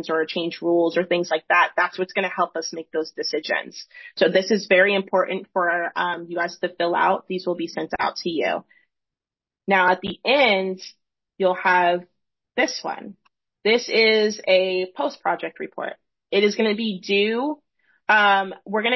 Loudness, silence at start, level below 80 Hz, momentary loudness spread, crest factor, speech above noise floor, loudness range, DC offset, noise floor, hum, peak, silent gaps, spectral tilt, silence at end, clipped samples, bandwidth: -21 LUFS; 0 s; -68 dBFS; 13 LU; 18 dB; over 68 dB; 3 LU; under 0.1%; under -90 dBFS; none; -4 dBFS; none; -4 dB/octave; 0 s; under 0.1%; 6.2 kHz